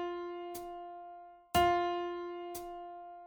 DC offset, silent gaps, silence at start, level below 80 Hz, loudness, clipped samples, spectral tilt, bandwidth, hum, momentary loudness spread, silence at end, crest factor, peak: under 0.1%; none; 0 s; -58 dBFS; -36 LUFS; under 0.1%; -4.5 dB/octave; over 20 kHz; none; 18 LU; 0 s; 20 dB; -16 dBFS